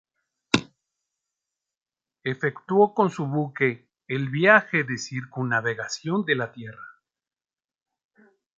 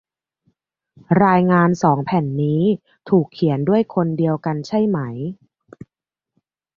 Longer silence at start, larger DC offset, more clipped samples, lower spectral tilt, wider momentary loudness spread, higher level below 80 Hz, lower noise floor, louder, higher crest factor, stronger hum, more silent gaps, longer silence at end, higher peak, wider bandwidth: second, 0.55 s vs 1.1 s; neither; neither; second, -5.5 dB/octave vs -8.5 dB/octave; first, 15 LU vs 9 LU; second, -66 dBFS vs -58 dBFS; first, under -90 dBFS vs -85 dBFS; second, -24 LUFS vs -18 LUFS; first, 24 dB vs 18 dB; neither; neither; first, 1.7 s vs 1.4 s; about the same, -2 dBFS vs 0 dBFS; first, 8.8 kHz vs 7.2 kHz